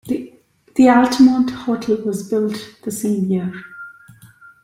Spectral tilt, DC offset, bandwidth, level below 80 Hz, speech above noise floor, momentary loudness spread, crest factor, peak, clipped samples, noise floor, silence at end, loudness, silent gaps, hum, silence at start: -6 dB/octave; under 0.1%; 16 kHz; -56 dBFS; 33 dB; 18 LU; 16 dB; -2 dBFS; under 0.1%; -49 dBFS; 0.7 s; -17 LUFS; none; none; 0.05 s